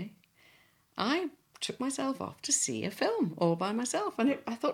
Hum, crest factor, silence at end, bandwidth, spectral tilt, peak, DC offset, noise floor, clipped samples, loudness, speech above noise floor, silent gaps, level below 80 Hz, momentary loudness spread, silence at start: none; 18 dB; 0 s; 16.5 kHz; -3.5 dB/octave; -14 dBFS; under 0.1%; -65 dBFS; under 0.1%; -32 LUFS; 33 dB; none; -76 dBFS; 10 LU; 0 s